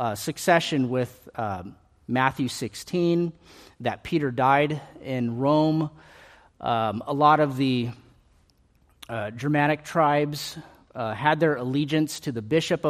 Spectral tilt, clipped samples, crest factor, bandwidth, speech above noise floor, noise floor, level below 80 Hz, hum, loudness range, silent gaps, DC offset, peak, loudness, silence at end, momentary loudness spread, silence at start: -5.5 dB/octave; under 0.1%; 22 dB; 15 kHz; 37 dB; -62 dBFS; -60 dBFS; none; 3 LU; none; under 0.1%; -4 dBFS; -25 LUFS; 0 s; 12 LU; 0 s